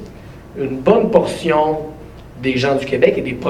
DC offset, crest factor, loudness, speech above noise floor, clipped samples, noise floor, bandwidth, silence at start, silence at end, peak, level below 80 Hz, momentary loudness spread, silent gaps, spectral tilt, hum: under 0.1%; 18 dB; -16 LUFS; 20 dB; under 0.1%; -36 dBFS; 13 kHz; 0 s; 0 s; 0 dBFS; -42 dBFS; 21 LU; none; -6.5 dB/octave; none